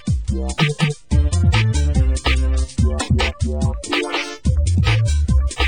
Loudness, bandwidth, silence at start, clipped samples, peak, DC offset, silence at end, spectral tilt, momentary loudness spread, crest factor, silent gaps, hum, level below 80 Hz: -19 LUFS; 16 kHz; 0.05 s; under 0.1%; -4 dBFS; 0.7%; 0 s; -5.5 dB/octave; 5 LU; 12 dB; none; none; -20 dBFS